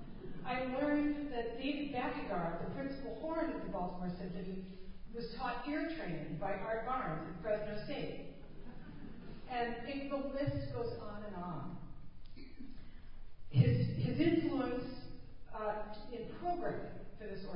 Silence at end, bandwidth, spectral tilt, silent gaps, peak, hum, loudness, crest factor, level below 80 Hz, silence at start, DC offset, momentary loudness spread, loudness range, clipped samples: 0 s; 5.2 kHz; -6.5 dB/octave; none; -16 dBFS; none; -39 LUFS; 22 dB; -54 dBFS; 0 s; under 0.1%; 20 LU; 6 LU; under 0.1%